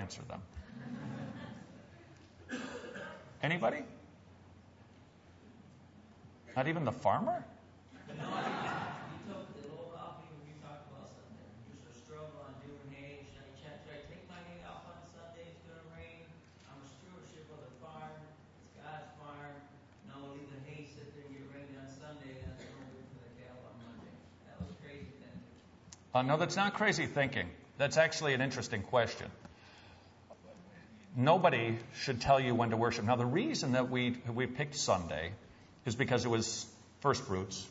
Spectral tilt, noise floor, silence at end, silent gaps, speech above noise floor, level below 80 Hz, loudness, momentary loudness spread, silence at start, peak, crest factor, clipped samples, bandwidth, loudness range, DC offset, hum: -4 dB/octave; -60 dBFS; 0 s; none; 27 dB; -66 dBFS; -35 LUFS; 24 LU; 0 s; -14 dBFS; 24 dB; under 0.1%; 7.6 kHz; 20 LU; under 0.1%; none